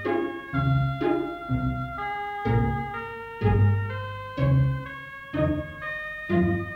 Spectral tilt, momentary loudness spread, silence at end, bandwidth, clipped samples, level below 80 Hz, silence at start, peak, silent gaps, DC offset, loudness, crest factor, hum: -9.5 dB/octave; 10 LU; 0 s; 5.2 kHz; under 0.1%; -40 dBFS; 0 s; -10 dBFS; none; under 0.1%; -27 LUFS; 16 dB; none